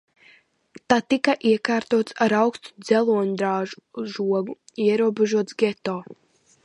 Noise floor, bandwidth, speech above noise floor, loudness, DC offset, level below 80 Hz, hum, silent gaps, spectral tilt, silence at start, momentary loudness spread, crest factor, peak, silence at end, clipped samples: -56 dBFS; 11.5 kHz; 34 dB; -22 LUFS; under 0.1%; -68 dBFS; none; none; -5.5 dB/octave; 0.75 s; 12 LU; 20 dB; -2 dBFS; 0.5 s; under 0.1%